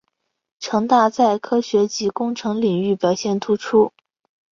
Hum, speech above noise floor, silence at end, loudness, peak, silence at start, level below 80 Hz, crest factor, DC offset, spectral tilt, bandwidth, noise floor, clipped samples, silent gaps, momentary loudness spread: none; 56 dB; 0.65 s; -19 LUFS; -4 dBFS; 0.6 s; -62 dBFS; 16 dB; under 0.1%; -5.5 dB/octave; 7.6 kHz; -74 dBFS; under 0.1%; none; 6 LU